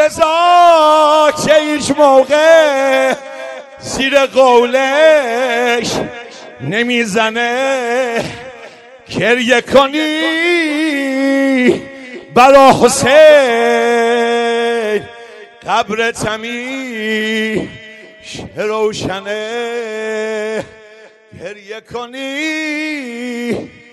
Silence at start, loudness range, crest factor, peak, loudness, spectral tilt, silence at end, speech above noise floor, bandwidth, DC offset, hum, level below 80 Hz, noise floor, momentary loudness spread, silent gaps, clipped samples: 0 s; 12 LU; 12 dB; 0 dBFS; -12 LUFS; -3.5 dB/octave; 0.25 s; 28 dB; 12.5 kHz; under 0.1%; none; -48 dBFS; -40 dBFS; 19 LU; none; 0.6%